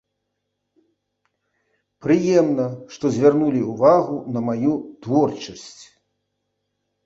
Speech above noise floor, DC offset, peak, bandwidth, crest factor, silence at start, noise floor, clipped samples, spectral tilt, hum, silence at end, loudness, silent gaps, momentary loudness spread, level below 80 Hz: 58 dB; under 0.1%; -2 dBFS; 7.8 kHz; 20 dB; 2.05 s; -77 dBFS; under 0.1%; -7 dB/octave; none; 1.2 s; -20 LUFS; none; 14 LU; -62 dBFS